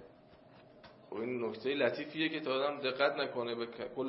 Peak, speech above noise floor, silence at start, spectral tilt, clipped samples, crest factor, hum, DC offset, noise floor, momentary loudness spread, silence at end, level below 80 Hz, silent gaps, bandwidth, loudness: -14 dBFS; 24 dB; 0 s; -2 dB/octave; under 0.1%; 22 dB; none; under 0.1%; -60 dBFS; 8 LU; 0 s; -78 dBFS; none; 5.8 kHz; -35 LUFS